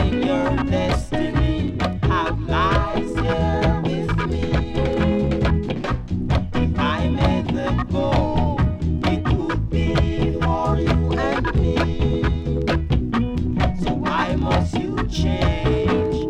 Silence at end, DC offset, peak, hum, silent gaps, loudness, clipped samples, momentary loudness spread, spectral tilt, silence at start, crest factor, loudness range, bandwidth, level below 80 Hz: 0 s; under 0.1%; -4 dBFS; none; none; -21 LUFS; under 0.1%; 3 LU; -7.5 dB/octave; 0 s; 16 dB; 1 LU; 9.8 kHz; -26 dBFS